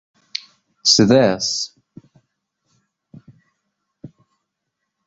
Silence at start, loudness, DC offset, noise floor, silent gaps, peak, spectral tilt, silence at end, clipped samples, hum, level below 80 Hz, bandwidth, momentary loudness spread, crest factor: 0.85 s; -16 LUFS; under 0.1%; -78 dBFS; none; 0 dBFS; -3.5 dB/octave; 1 s; under 0.1%; none; -56 dBFS; 8 kHz; 19 LU; 22 dB